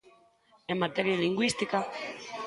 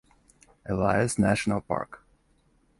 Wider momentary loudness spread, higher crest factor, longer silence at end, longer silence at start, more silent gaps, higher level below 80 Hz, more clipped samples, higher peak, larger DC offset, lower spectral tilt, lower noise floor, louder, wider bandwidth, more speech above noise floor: about the same, 11 LU vs 13 LU; about the same, 20 dB vs 20 dB; second, 0 s vs 0.85 s; second, 0.05 s vs 0.65 s; neither; second, -70 dBFS vs -50 dBFS; neither; about the same, -12 dBFS vs -10 dBFS; neither; about the same, -4.5 dB/octave vs -5.5 dB/octave; about the same, -64 dBFS vs -66 dBFS; second, -30 LUFS vs -26 LUFS; about the same, 11.5 kHz vs 11.5 kHz; second, 34 dB vs 40 dB